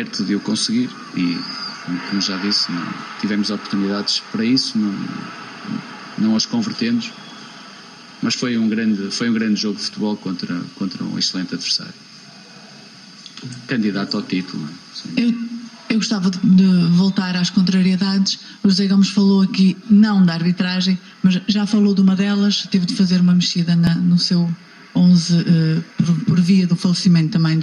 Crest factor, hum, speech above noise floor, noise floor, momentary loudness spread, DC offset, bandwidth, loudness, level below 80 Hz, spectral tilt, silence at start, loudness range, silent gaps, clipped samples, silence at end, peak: 14 dB; none; 24 dB; -41 dBFS; 14 LU; under 0.1%; 10.5 kHz; -18 LUFS; -58 dBFS; -5.5 dB/octave; 0 s; 8 LU; none; under 0.1%; 0 s; -4 dBFS